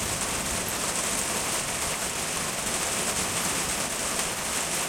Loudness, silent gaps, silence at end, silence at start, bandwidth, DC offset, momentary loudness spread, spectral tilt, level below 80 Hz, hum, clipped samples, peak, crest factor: -26 LUFS; none; 0 s; 0 s; 16.5 kHz; under 0.1%; 2 LU; -1.5 dB/octave; -48 dBFS; none; under 0.1%; -12 dBFS; 16 dB